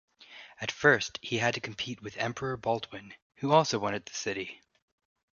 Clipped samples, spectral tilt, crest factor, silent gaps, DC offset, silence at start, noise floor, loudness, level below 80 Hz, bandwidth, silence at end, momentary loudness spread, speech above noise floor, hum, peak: under 0.1%; -4 dB/octave; 24 dB; 3.22-3.30 s; under 0.1%; 0.2 s; -52 dBFS; -30 LUFS; -66 dBFS; 7.4 kHz; 0.8 s; 17 LU; 22 dB; none; -8 dBFS